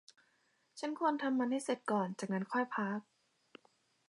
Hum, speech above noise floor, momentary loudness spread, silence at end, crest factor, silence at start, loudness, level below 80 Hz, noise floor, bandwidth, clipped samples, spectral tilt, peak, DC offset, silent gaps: none; 40 dB; 9 LU; 1.1 s; 18 dB; 0.75 s; -37 LUFS; -90 dBFS; -76 dBFS; 11.5 kHz; under 0.1%; -5.5 dB/octave; -20 dBFS; under 0.1%; none